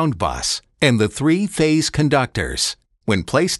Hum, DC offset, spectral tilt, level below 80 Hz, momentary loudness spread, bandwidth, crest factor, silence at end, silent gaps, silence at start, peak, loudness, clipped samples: none; under 0.1%; -4.5 dB/octave; -40 dBFS; 5 LU; 12.5 kHz; 16 dB; 0 s; none; 0 s; -2 dBFS; -19 LUFS; under 0.1%